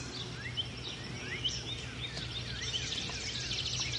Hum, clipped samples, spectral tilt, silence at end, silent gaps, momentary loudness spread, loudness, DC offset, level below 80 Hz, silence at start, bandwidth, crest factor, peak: none; under 0.1%; -2.5 dB/octave; 0 s; none; 6 LU; -36 LUFS; under 0.1%; -52 dBFS; 0 s; 11.5 kHz; 16 dB; -22 dBFS